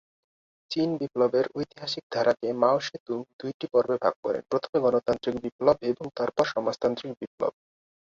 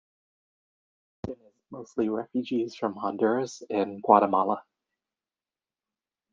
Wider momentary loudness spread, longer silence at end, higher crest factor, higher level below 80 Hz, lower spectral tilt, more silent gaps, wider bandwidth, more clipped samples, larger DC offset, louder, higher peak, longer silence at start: second, 9 LU vs 20 LU; second, 0.65 s vs 1.7 s; second, 20 dB vs 26 dB; about the same, -64 dBFS vs -68 dBFS; about the same, -5.5 dB/octave vs -6.5 dB/octave; first, 2.03-2.10 s, 3.00-3.06 s, 3.33-3.39 s, 3.54-3.60 s, 4.16-4.23 s, 4.69-4.73 s, 5.52-5.59 s, 7.27-7.38 s vs none; about the same, 7.6 kHz vs 7.6 kHz; neither; neither; about the same, -27 LUFS vs -27 LUFS; about the same, -6 dBFS vs -4 dBFS; second, 0.7 s vs 1.25 s